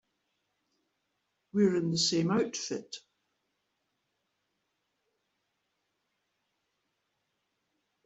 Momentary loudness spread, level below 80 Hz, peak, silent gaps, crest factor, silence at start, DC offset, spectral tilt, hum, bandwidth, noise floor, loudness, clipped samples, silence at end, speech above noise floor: 14 LU; -78 dBFS; -14 dBFS; none; 22 dB; 1.55 s; under 0.1%; -4.5 dB/octave; none; 8.2 kHz; -81 dBFS; -30 LUFS; under 0.1%; 5.05 s; 52 dB